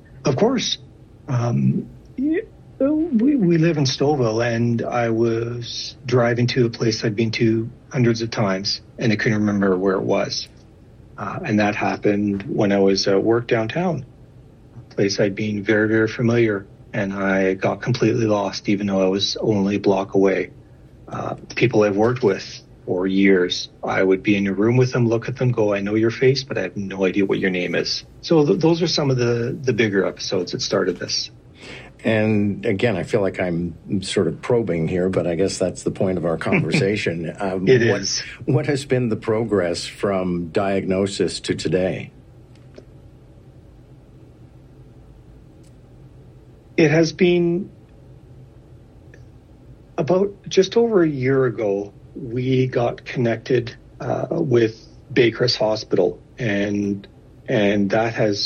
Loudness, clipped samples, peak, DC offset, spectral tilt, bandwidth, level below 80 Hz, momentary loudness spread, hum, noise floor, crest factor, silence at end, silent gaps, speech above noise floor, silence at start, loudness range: -20 LUFS; under 0.1%; -2 dBFS; under 0.1%; -6 dB/octave; 10.5 kHz; -52 dBFS; 9 LU; none; -46 dBFS; 18 dB; 0 s; none; 26 dB; 0.1 s; 3 LU